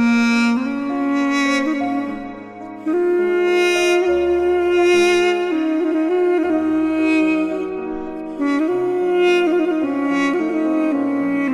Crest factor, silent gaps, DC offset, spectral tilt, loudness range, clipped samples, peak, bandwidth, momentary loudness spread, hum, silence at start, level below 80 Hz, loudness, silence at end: 10 dB; none; under 0.1%; -4.5 dB/octave; 3 LU; under 0.1%; -6 dBFS; 12.5 kHz; 9 LU; none; 0 s; -50 dBFS; -18 LUFS; 0 s